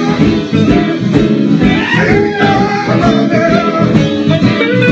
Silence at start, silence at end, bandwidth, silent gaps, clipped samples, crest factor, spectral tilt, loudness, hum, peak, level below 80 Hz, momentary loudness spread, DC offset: 0 s; 0 s; 8 kHz; none; 0.3%; 10 dB; -7 dB/octave; -10 LUFS; none; 0 dBFS; -32 dBFS; 2 LU; under 0.1%